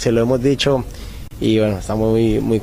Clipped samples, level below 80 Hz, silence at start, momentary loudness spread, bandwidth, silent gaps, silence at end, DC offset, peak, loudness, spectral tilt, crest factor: under 0.1%; -34 dBFS; 0 s; 14 LU; 15.5 kHz; none; 0 s; under 0.1%; -4 dBFS; -17 LUFS; -6.5 dB/octave; 14 dB